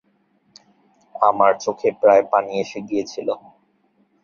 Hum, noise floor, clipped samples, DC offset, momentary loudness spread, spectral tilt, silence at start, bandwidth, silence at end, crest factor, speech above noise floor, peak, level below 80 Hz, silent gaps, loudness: none; -63 dBFS; under 0.1%; under 0.1%; 12 LU; -5 dB/octave; 1.15 s; 7.2 kHz; 0.85 s; 20 dB; 44 dB; 0 dBFS; -66 dBFS; none; -19 LUFS